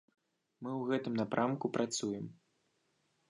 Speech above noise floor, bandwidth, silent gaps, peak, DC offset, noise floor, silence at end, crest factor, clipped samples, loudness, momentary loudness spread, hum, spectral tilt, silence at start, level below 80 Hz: 42 dB; 10.5 kHz; none; -18 dBFS; under 0.1%; -78 dBFS; 1 s; 20 dB; under 0.1%; -36 LUFS; 10 LU; none; -5 dB/octave; 0.6 s; -80 dBFS